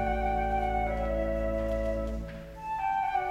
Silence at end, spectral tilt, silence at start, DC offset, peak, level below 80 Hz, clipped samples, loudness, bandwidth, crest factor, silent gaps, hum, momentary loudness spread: 0 s; -7.5 dB/octave; 0 s; under 0.1%; -18 dBFS; -36 dBFS; under 0.1%; -31 LUFS; 8.6 kHz; 12 dB; none; none; 8 LU